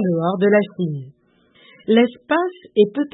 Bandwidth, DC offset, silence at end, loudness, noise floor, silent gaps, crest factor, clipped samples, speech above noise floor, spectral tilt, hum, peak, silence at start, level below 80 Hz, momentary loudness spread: 4 kHz; under 0.1%; 0.05 s; -19 LUFS; -55 dBFS; none; 16 dB; under 0.1%; 37 dB; -12 dB/octave; none; -4 dBFS; 0 s; -68 dBFS; 9 LU